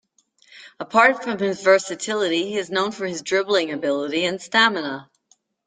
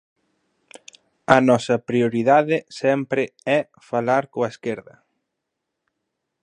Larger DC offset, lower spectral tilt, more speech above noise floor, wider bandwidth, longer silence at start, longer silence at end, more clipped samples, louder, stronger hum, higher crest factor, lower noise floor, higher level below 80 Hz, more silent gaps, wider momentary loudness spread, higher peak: neither; second, -3 dB/octave vs -6 dB/octave; second, 42 dB vs 60 dB; second, 9.6 kHz vs 11 kHz; second, 0.55 s vs 1.3 s; second, 0.65 s vs 1.65 s; neither; about the same, -21 LUFS vs -20 LUFS; neither; about the same, 20 dB vs 22 dB; second, -63 dBFS vs -80 dBFS; second, -70 dBFS vs -64 dBFS; neither; about the same, 10 LU vs 11 LU; about the same, -2 dBFS vs 0 dBFS